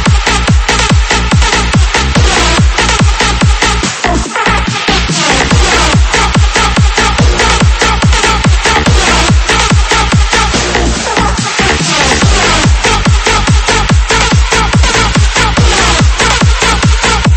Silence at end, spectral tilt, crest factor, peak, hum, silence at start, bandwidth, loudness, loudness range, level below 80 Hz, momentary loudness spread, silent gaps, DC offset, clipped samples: 0 s; -3.5 dB/octave; 8 dB; 0 dBFS; none; 0 s; 8.8 kHz; -8 LUFS; 1 LU; -12 dBFS; 3 LU; none; under 0.1%; 0.3%